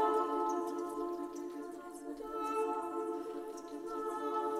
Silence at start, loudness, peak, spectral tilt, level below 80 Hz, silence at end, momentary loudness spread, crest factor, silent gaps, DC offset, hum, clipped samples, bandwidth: 0 s; -39 LUFS; -22 dBFS; -4 dB/octave; -72 dBFS; 0 s; 11 LU; 16 dB; none; under 0.1%; none; under 0.1%; 16 kHz